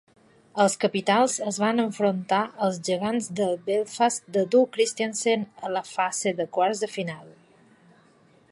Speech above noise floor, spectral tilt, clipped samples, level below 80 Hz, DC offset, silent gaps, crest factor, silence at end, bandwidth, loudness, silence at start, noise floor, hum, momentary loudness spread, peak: 34 dB; -4 dB/octave; under 0.1%; -74 dBFS; under 0.1%; none; 18 dB; 1.2 s; 11.5 kHz; -25 LUFS; 0.55 s; -58 dBFS; none; 8 LU; -8 dBFS